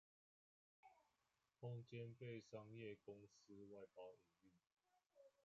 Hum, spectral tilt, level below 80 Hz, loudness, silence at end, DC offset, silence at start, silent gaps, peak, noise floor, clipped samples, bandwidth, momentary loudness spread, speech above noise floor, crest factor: none; -6.5 dB/octave; under -90 dBFS; -59 LUFS; 0.15 s; under 0.1%; 0.85 s; none; -42 dBFS; -90 dBFS; under 0.1%; 7.4 kHz; 9 LU; 32 dB; 18 dB